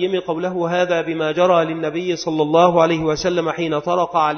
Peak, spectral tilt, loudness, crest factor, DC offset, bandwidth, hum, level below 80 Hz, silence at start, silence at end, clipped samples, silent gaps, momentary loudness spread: 0 dBFS; -5.5 dB/octave; -18 LUFS; 18 dB; under 0.1%; 6.6 kHz; none; -52 dBFS; 0 s; 0 s; under 0.1%; none; 8 LU